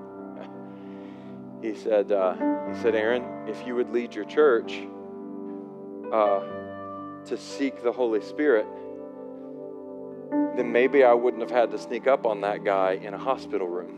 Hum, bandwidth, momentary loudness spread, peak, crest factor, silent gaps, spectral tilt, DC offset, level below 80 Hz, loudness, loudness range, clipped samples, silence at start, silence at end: none; 9.6 kHz; 18 LU; -8 dBFS; 18 dB; none; -6 dB/octave; under 0.1%; -80 dBFS; -25 LUFS; 5 LU; under 0.1%; 0 s; 0 s